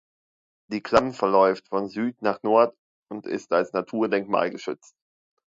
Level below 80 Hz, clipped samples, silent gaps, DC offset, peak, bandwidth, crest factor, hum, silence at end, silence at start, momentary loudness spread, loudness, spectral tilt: -62 dBFS; under 0.1%; 2.79-3.02 s; under 0.1%; -2 dBFS; 7.8 kHz; 22 dB; none; 0.85 s; 0.7 s; 14 LU; -24 LUFS; -6 dB/octave